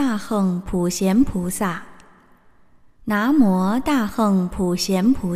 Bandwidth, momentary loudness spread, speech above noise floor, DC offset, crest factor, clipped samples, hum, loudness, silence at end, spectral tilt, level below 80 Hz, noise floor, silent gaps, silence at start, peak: 15.5 kHz; 8 LU; 36 dB; under 0.1%; 16 dB; under 0.1%; none; -20 LUFS; 0 s; -6 dB/octave; -42 dBFS; -55 dBFS; none; 0 s; -4 dBFS